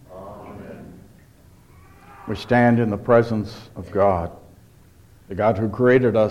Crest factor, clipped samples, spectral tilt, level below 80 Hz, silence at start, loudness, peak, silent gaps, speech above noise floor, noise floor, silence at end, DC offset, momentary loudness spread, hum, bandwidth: 18 dB; under 0.1%; -8.5 dB/octave; -50 dBFS; 0.1 s; -19 LUFS; -4 dBFS; none; 31 dB; -50 dBFS; 0 s; under 0.1%; 22 LU; none; 12.5 kHz